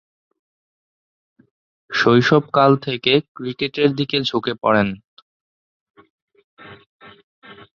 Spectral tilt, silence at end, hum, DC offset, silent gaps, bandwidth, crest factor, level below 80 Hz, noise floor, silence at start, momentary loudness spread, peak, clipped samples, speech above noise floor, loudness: -6.5 dB/octave; 0.2 s; none; under 0.1%; 3.28-3.35 s, 5.04-5.94 s, 6.10-6.28 s, 6.44-6.57 s, 6.86-6.99 s, 7.23-7.42 s; 7.2 kHz; 20 dB; -58 dBFS; under -90 dBFS; 1.9 s; 10 LU; 0 dBFS; under 0.1%; over 73 dB; -18 LUFS